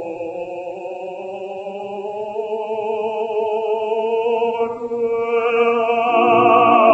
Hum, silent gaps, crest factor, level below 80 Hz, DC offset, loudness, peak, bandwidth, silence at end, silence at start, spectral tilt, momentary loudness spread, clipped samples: none; none; 18 dB; -66 dBFS; under 0.1%; -19 LUFS; 0 dBFS; 7.8 kHz; 0 s; 0 s; -6.5 dB/octave; 16 LU; under 0.1%